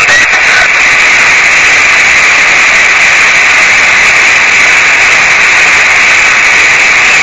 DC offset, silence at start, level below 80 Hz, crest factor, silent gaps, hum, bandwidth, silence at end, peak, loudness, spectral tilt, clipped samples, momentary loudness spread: 0.9%; 0 s; -36 dBFS; 4 dB; none; none; 11 kHz; 0 s; 0 dBFS; -2 LUFS; 0 dB/octave; 5%; 1 LU